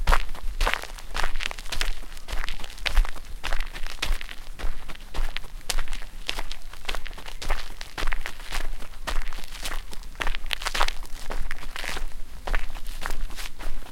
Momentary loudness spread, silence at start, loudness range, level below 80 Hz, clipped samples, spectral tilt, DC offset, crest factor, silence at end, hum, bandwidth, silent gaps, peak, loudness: 11 LU; 0 s; 4 LU; -28 dBFS; under 0.1%; -2.5 dB/octave; under 0.1%; 22 dB; 0 s; none; 15 kHz; none; -2 dBFS; -33 LUFS